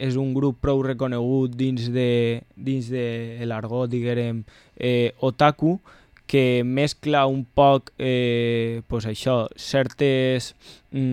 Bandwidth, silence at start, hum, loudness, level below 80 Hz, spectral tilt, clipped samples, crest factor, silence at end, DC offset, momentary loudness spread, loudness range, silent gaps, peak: 13 kHz; 0 s; none; -23 LUFS; -48 dBFS; -7 dB/octave; under 0.1%; 18 dB; 0 s; under 0.1%; 9 LU; 4 LU; none; -4 dBFS